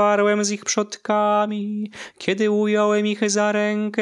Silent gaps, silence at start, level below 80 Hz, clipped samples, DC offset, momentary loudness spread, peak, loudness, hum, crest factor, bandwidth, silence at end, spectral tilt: none; 0 s; -70 dBFS; under 0.1%; under 0.1%; 9 LU; -4 dBFS; -21 LUFS; none; 16 dB; 11 kHz; 0 s; -4 dB/octave